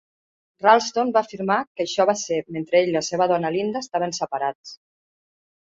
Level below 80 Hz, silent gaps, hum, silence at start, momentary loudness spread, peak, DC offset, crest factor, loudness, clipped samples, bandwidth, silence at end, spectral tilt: -68 dBFS; 1.67-1.75 s, 4.55-4.64 s; none; 0.6 s; 9 LU; -2 dBFS; under 0.1%; 20 dB; -22 LUFS; under 0.1%; 8 kHz; 0.9 s; -4 dB/octave